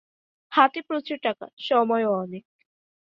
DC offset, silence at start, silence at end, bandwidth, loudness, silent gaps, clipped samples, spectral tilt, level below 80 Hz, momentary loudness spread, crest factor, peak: under 0.1%; 0.5 s; 0.65 s; 7.2 kHz; -24 LUFS; 1.53-1.57 s; under 0.1%; -6.5 dB/octave; -76 dBFS; 13 LU; 22 dB; -4 dBFS